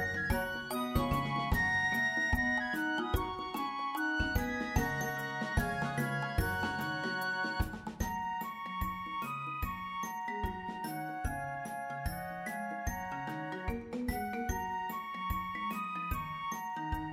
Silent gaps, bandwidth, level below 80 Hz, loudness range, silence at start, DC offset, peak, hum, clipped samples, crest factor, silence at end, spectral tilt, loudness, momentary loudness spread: none; 16 kHz; -44 dBFS; 7 LU; 0 s; under 0.1%; -16 dBFS; none; under 0.1%; 18 dB; 0 s; -5 dB/octave; -35 LUFS; 9 LU